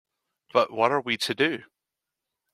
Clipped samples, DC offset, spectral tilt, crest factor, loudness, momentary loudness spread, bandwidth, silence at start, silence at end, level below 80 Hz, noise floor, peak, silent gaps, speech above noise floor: under 0.1%; under 0.1%; -4 dB/octave; 22 dB; -25 LUFS; 4 LU; 15.5 kHz; 0.55 s; 0.9 s; -74 dBFS; -86 dBFS; -6 dBFS; none; 62 dB